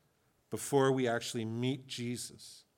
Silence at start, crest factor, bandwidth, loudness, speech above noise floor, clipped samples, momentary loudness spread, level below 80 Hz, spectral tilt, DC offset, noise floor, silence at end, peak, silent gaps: 0.5 s; 20 dB; 17 kHz; -34 LUFS; 39 dB; under 0.1%; 15 LU; -80 dBFS; -5 dB/octave; under 0.1%; -73 dBFS; 0.2 s; -16 dBFS; none